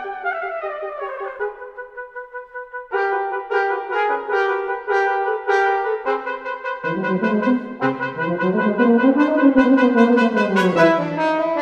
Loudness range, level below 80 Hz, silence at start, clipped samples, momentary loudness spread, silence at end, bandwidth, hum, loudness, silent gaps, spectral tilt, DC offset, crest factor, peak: 9 LU; -60 dBFS; 0 s; under 0.1%; 14 LU; 0 s; 9.2 kHz; none; -19 LUFS; none; -7 dB/octave; under 0.1%; 18 dB; -2 dBFS